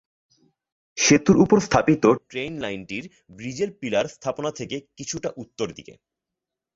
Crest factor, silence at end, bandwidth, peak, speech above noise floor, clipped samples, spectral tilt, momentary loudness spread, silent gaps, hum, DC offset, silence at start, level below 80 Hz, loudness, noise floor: 20 dB; 0.85 s; 8 kHz; -4 dBFS; 64 dB; under 0.1%; -4.5 dB/octave; 17 LU; none; none; under 0.1%; 0.95 s; -54 dBFS; -22 LUFS; -86 dBFS